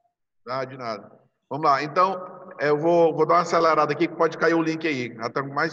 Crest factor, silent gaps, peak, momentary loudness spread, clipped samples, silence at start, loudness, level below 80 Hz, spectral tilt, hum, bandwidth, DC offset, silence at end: 18 dB; none; -6 dBFS; 14 LU; under 0.1%; 0.45 s; -22 LUFS; -74 dBFS; -6 dB/octave; none; 7.8 kHz; under 0.1%; 0 s